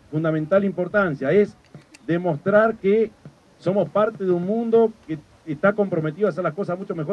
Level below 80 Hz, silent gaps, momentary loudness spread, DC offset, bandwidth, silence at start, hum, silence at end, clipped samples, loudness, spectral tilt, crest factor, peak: -60 dBFS; none; 9 LU; under 0.1%; 9.2 kHz; 0.1 s; none; 0 s; under 0.1%; -21 LUFS; -9 dB/octave; 18 dB; -4 dBFS